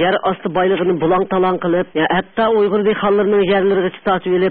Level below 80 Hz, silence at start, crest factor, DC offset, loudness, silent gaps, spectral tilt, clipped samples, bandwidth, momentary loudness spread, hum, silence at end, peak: -50 dBFS; 0 s; 10 dB; under 0.1%; -16 LUFS; none; -11.5 dB/octave; under 0.1%; 4.3 kHz; 4 LU; none; 0 s; -4 dBFS